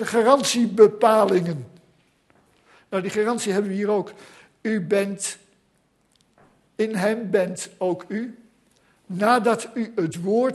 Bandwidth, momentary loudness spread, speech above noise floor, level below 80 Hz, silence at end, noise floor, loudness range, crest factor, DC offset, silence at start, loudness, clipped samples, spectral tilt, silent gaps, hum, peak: 12.5 kHz; 14 LU; 44 dB; -70 dBFS; 0 s; -65 dBFS; 6 LU; 22 dB; under 0.1%; 0 s; -22 LUFS; under 0.1%; -5 dB/octave; none; none; -2 dBFS